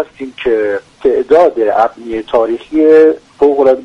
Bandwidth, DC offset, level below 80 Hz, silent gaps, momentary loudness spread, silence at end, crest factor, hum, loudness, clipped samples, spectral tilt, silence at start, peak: 6.8 kHz; under 0.1%; -46 dBFS; none; 9 LU; 0 s; 10 dB; none; -11 LUFS; under 0.1%; -6 dB/octave; 0 s; 0 dBFS